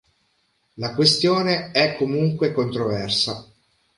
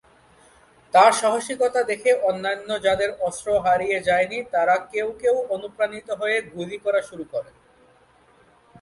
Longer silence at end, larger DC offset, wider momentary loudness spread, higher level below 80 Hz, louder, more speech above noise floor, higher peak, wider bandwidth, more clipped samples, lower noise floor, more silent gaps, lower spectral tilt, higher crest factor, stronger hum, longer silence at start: second, 0.55 s vs 1.4 s; neither; about the same, 9 LU vs 10 LU; about the same, -56 dBFS vs -58 dBFS; about the same, -20 LUFS vs -22 LUFS; first, 46 dB vs 35 dB; about the same, -4 dBFS vs -2 dBFS; about the same, 11.5 kHz vs 11.5 kHz; neither; first, -67 dBFS vs -56 dBFS; neither; first, -4.5 dB/octave vs -3 dB/octave; about the same, 18 dB vs 20 dB; neither; second, 0.75 s vs 0.95 s